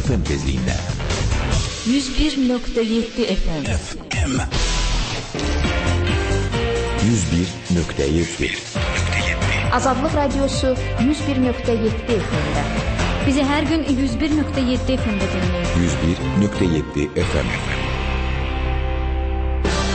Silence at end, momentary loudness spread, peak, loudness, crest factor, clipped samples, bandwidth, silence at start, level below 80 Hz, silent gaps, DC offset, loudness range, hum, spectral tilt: 0 s; 5 LU; -6 dBFS; -20 LUFS; 14 dB; under 0.1%; 8.8 kHz; 0 s; -26 dBFS; none; under 0.1%; 2 LU; none; -5.5 dB/octave